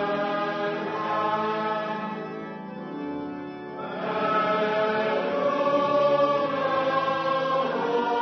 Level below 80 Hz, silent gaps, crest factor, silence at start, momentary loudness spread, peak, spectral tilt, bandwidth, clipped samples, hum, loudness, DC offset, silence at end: -72 dBFS; none; 14 dB; 0 s; 13 LU; -12 dBFS; -6.5 dB/octave; 6.4 kHz; under 0.1%; none; -26 LUFS; under 0.1%; 0 s